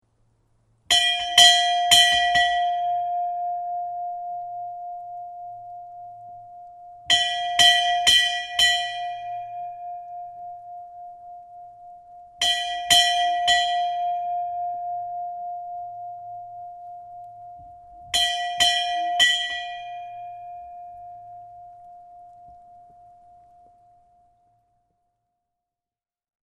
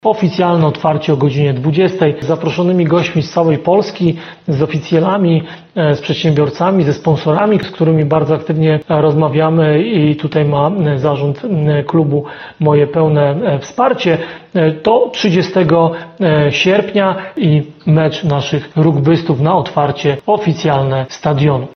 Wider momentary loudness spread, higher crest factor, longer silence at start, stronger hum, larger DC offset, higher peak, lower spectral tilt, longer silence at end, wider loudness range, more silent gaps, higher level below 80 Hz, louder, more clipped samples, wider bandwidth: first, 25 LU vs 5 LU; first, 24 dB vs 12 dB; first, 0.9 s vs 0.05 s; neither; neither; about the same, 0 dBFS vs 0 dBFS; second, 1.5 dB/octave vs -7.5 dB/octave; first, 3.75 s vs 0.05 s; first, 18 LU vs 1 LU; neither; second, -58 dBFS vs -48 dBFS; second, -20 LUFS vs -13 LUFS; neither; first, 14.5 kHz vs 6.6 kHz